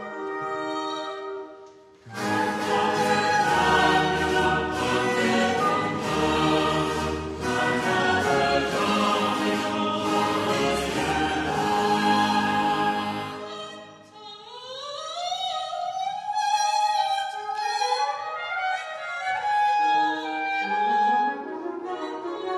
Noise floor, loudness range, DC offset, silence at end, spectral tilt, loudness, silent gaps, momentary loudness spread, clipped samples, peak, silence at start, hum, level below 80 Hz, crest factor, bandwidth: -48 dBFS; 6 LU; under 0.1%; 0 s; -4 dB/octave; -24 LUFS; none; 11 LU; under 0.1%; -10 dBFS; 0 s; none; -50 dBFS; 16 dB; 14.5 kHz